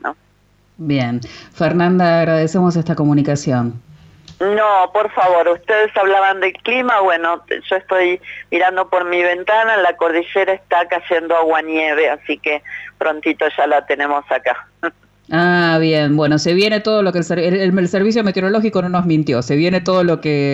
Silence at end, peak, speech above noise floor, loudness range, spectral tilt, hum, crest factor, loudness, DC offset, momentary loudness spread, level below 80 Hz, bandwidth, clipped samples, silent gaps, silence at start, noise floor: 0 s; -4 dBFS; 39 dB; 2 LU; -6.5 dB/octave; 50 Hz at -45 dBFS; 12 dB; -16 LUFS; under 0.1%; 7 LU; -56 dBFS; 8.2 kHz; under 0.1%; none; 0.05 s; -55 dBFS